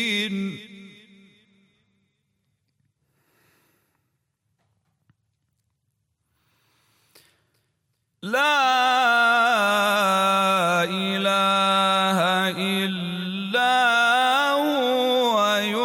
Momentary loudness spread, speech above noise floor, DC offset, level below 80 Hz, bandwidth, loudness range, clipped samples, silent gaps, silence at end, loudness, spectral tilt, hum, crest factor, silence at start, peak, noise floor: 9 LU; 53 dB; under 0.1%; -76 dBFS; 16.5 kHz; 8 LU; under 0.1%; none; 0 s; -20 LUFS; -3.5 dB/octave; none; 14 dB; 0 s; -10 dBFS; -75 dBFS